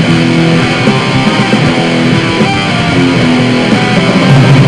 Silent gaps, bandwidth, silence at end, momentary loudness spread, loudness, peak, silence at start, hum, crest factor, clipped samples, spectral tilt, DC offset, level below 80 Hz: none; 11 kHz; 0 s; 3 LU; -8 LUFS; 0 dBFS; 0 s; none; 8 dB; 3%; -6 dB/octave; 0.7%; -36 dBFS